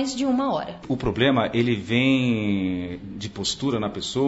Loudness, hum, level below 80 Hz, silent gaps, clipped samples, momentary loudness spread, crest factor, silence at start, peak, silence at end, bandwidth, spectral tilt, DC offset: -23 LUFS; none; -48 dBFS; none; under 0.1%; 10 LU; 16 dB; 0 s; -6 dBFS; 0 s; 8 kHz; -5.5 dB/octave; under 0.1%